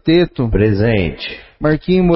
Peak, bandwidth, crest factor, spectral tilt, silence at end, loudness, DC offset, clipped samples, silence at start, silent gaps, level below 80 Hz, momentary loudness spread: -2 dBFS; 5.8 kHz; 14 dB; -12 dB/octave; 0 s; -15 LUFS; under 0.1%; under 0.1%; 0.05 s; none; -28 dBFS; 9 LU